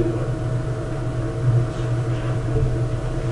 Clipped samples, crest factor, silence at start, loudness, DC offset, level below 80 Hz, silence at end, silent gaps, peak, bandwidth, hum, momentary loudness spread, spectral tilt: under 0.1%; 14 dB; 0 s; -23 LUFS; under 0.1%; -30 dBFS; 0 s; none; -8 dBFS; 10.5 kHz; none; 5 LU; -8 dB/octave